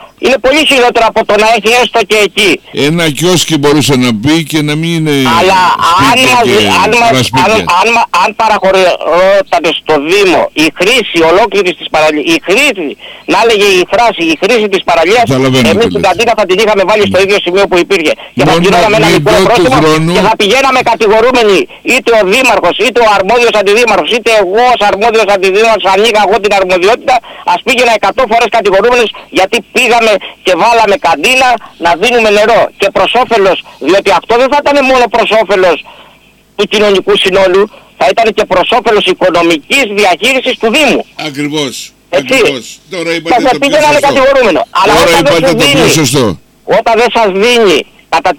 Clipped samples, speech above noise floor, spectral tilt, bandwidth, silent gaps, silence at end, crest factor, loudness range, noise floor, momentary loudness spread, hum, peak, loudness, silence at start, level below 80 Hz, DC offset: under 0.1%; 35 dB; -4 dB/octave; 19 kHz; none; 0.05 s; 6 dB; 2 LU; -42 dBFS; 5 LU; none; 0 dBFS; -7 LUFS; 0 s; -36 dBFS; under 0.1%